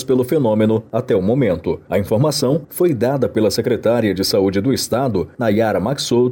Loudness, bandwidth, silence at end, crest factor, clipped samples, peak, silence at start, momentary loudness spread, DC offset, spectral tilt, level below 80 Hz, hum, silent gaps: -17 LUFS; 17 kHz; 0 s; 10 dB; under 0.1%; -6 dBFS; 0 s; 4 LU; under 0.1%; -6 dB/octave; -48 dBFS; none; none